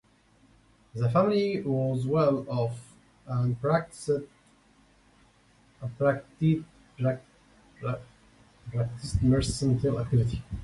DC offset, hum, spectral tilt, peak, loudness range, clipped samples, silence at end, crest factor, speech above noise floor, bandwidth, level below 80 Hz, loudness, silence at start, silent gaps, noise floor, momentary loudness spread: under 0.1%; none; -7.5 dB/octave; -10 dBFS; 4 LU; under 0.1%; 0 s; 20 dB; 35 dB; 11.5 kHz; -46 dBFS; -28 LUFS; 0.95 s; none; -62 dBFS; 14 LU